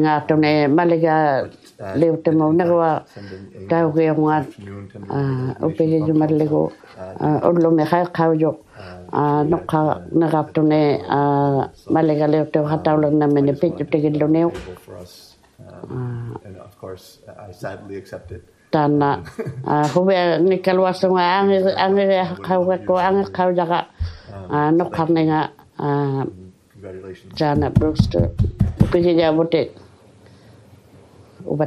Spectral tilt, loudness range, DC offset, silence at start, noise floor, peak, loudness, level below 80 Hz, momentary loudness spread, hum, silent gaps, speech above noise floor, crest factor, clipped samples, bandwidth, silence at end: -8.5 dB/octave; 6 LU; under 0.1%; 0 s; -47 dBFS; 0 dBFS; -18 LUFS; -42 dBFS; 19 LU; none; none; 29 dB; 18 dB; under 0.1%; 11.5 kHz; 0 s